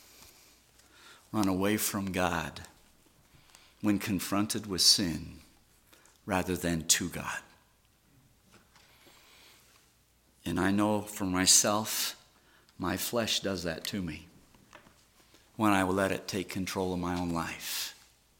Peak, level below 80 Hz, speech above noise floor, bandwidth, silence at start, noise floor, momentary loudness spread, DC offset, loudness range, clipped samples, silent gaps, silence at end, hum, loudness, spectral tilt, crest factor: -6 dBFS; -60 dBFS; 36 dB; 17 kHz; 0.2 s; -66 dBFS; 17 LU; under 0.1%; 7 LU; under 0.1%; none; 0.45 s; none; -29 LUFS; -3 dB/octave; 26 dB